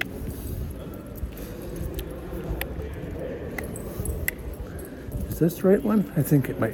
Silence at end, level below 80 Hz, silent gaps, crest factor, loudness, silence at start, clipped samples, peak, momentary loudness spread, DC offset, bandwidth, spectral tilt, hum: 0 s; -38 dBFS; none; 24 dB; -28 LUFS; 0 s; under 0.1%; -4 dBFS; 15 LU; under 0.1%; 18 kHz; -6.5 dB/octave; none